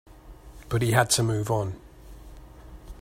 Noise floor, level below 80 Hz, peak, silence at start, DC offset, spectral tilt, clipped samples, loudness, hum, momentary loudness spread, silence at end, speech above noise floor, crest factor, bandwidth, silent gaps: -46 dBFS; -46 dBFS; -6 dBFS; 0.25 s; under 0.1%; -4 dB/octave; under 0.1%; -25 LUFS; none; 19 LU; 0 s; 22 dB; 22 dB; 16 kHz; none